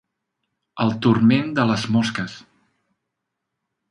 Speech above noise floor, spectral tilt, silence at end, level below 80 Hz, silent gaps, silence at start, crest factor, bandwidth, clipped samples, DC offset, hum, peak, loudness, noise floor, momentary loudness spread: 61 dB; -6.5 dB/octave; 1.5 s; -58 dBFS; none; 0.75 s; 20 dB; 11 kHz; under 0.1%; under 0.1%; none; -4 dBFS; -20 LUFS; -80 dBFS; 13 LU